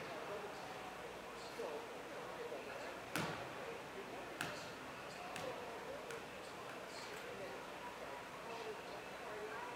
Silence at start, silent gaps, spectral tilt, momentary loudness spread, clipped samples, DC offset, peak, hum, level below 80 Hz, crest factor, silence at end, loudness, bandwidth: 0 s; none; -3.5 dB/octave; 4 LU; under 0.1%; under 0.1%; -20 dBFS; none; -74 dBFS; 28 dB; 0 s; -48 LUFS; 16 kHz